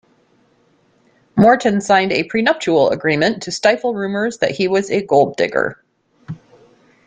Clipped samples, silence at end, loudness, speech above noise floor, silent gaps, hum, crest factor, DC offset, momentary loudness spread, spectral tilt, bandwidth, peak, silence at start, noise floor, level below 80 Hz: under 0.1%; 0.75 s; -16 LUFS; 42 dB; none; none; 16 dB; under 0.1%; 10 LU; -5 dB/octave; 9.4 kHz; -2 dBFS; 1.35 s; -57 dBFS; -56 dBFS